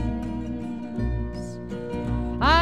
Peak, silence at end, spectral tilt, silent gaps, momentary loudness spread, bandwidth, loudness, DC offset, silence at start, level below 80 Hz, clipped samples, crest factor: -6 dBFS; 0 s; -6.5 dB/octave; none; 10 LU; 10.5 kHz; -29 LUFS; 0.5%; 0 s; -32 dBFS; under 0.1%; 20 dB